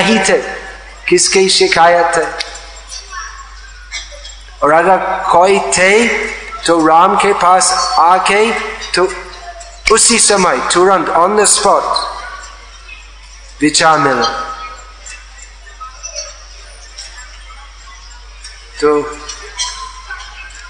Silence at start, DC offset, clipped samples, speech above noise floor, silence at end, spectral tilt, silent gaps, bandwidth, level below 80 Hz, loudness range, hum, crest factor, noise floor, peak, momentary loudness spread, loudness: 0 s; under 0.1%; 0.2%; 24 dB; 0 s; -2 dB/octave; none; 12 kHz; -36 dBFS; 13 LU; none; 14 dB; -34 dBFS; 0 dBFS; 22 LU; -10 LUFS